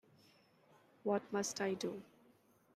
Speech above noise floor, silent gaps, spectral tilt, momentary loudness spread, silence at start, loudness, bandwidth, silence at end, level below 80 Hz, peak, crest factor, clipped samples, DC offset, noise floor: 31 dB; none; -4 dB/octave; 7 LU; 1.05 s; -40 LUFS; 15 kHz; 0.7 s; -84 dBFS; -24 dBFS; 20 dB; under 0.1%; under 0.1%; -70 dBFS